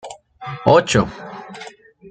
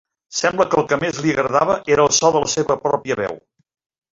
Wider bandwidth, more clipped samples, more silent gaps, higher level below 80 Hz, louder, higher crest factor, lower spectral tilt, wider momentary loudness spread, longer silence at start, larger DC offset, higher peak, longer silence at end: first, 9.4 kHz vs 7.8 kHz; neither; neither; about the same, -48 dBFS vs -52 dBFS; about the same, -16 LUFS vs -18 LUFS; about the same, 20 dB vs 16 dB; first, -5 dB/octave vs -3.5 dB/octave; first, 23 LU vs 9 LU; second, 0.05 s vs 0.3 s; neither; about the same, 0 dBFS vs -2 dBFS; second, 0.4 s vs 0.75 s